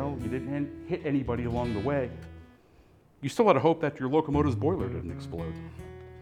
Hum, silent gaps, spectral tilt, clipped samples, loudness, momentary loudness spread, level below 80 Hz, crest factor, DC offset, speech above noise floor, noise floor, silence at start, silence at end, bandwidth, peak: none; none; -7.5 dB/octave; under 0.1%; -29 LUFS; 17 LU; -50 dBFS; 22 dB; under 0.1%; 30 dB; -58 dBFS; 0 s; 0 s; 14.5 kHz; -6 dBFS